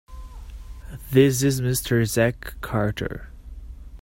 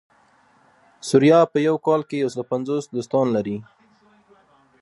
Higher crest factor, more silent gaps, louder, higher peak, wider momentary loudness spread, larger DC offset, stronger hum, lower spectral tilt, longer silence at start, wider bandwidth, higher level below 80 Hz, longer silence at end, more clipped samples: about the same, 20 dB vs 20 dB; neither; about the same, -22 LUFS vs -20 LUFS; about the same, -4 dBFS vs -2 dBFS; first, 24 LU vs 12 LU; neither; neither; about the same, -5.5 dB/octave vs -6.5 dB/octave; second, 0.1 s vs 1.05 s; first, 16.5 kHz vs 11.5 kHz; first, -40 dBFS vs -68 dBFS; second, 0 s vs 1.2 s; neither